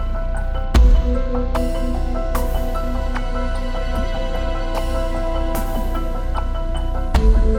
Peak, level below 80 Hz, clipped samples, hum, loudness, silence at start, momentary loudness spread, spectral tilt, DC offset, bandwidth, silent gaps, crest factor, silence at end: 0 dBFS; -18 dBFS; under 0.1%; none; -22 LUFS; 0 s; 8 LU; -6.5 dB/octave; under 0.1%; 16 kHz; none; 16 dB; 0 s